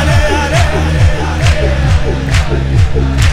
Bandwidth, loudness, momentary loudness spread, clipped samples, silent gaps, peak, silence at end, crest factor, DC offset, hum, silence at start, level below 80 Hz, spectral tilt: 14 kHz; -12 LUFS; 2 LU; under 0.1%; none; 0 dBFS; 0 s; 10 dB; under 0.1%; none; 0 s; -16 dBFS; -5.5 dB/octave